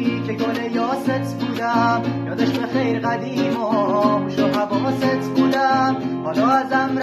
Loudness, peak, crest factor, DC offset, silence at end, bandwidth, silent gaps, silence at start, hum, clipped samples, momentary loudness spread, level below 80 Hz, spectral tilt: -20 LUFS; -4 dBFS; 16 dB; under 0.1%; 0 s; 13.5 kHz; none; 0 s; none; under 0.1%; 5 LU; -60 dBFS; -6.5 dB/octave